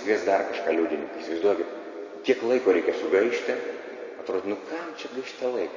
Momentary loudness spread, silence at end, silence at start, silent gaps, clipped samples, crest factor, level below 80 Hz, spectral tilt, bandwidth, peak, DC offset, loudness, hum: 12 LU; 0 s; 0 s; none; under 0.1%; 18 dB; -70 dBFS; -4.5 dB/octave; 7.6 kHz; -8 dBFS; under 0.1%; -27 LUFS; none